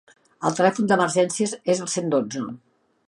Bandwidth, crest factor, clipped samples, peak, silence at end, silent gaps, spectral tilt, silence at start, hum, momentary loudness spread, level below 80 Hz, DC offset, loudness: 11.5 kHz; 20 dB; under 0.1%; -4 dBFS; 0.5 s; none; -4.5 dB/octave; 0.4 s; none; 12 LU; -68 dBFS; under 0.1%; -22 LUFS